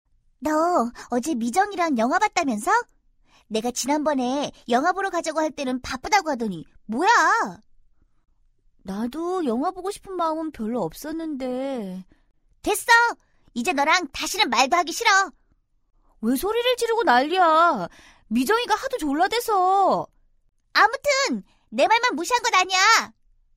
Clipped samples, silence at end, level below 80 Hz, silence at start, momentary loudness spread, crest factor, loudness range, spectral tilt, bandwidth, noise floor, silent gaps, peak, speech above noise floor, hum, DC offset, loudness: under 0.1%; 0.5 s; -56 dBFS; 0.4 s; 13 LU; 18 dB; 7 LU; -2.5 dB/octave; 16 kHz; -64 dBFS; none; -4 dBFS; 42 dB; none; under 0.1%; -22 LUFS